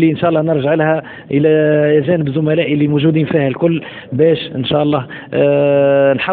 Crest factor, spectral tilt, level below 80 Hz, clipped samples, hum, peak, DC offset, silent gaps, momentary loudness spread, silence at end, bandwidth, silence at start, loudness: 12 dB; -12 dB/octave; -52 dBFS; under 0.1%; none; 0 dBFS; under 0.1%; none; 6 LU; 0 s; 4.4 kHz; 0 s; -14 LUFS